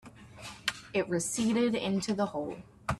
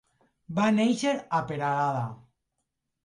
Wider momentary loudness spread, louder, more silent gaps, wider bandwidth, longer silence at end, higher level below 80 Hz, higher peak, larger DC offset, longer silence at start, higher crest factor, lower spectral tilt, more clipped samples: first, 15 LU vs 10 LU; second, -32 LUFS vs -27 LUFS; neither; first, 13.5 kHz vs 11 kHz; second, 0 s vs 0.9 s; first, -58 dBFS vs -68 dBFS; about the same, -14 dBFS vs -14 dBFS; neither; second, 0.05 s vs 0.5 s; first, 20 dB vs 14 dB; second, -4.5 dB/octave vs -6 dB/octave; neither